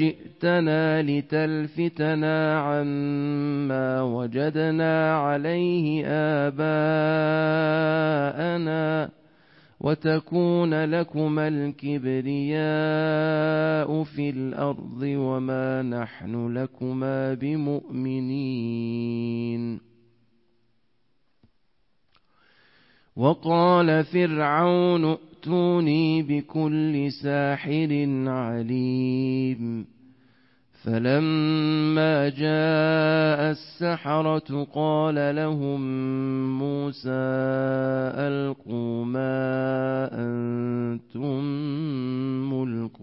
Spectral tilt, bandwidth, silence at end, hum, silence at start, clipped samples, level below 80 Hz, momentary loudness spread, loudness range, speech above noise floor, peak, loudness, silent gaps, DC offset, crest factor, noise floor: -11.5 dB/octave; 5.8 kHz; 0 s; none; 0 s; under 0.1%; -66 dBFS; 7 LU; 6 LU; 49 dB; -8 dBFS; -25 LUFS; none; under 0.1%; 16 dB; -73 dBFS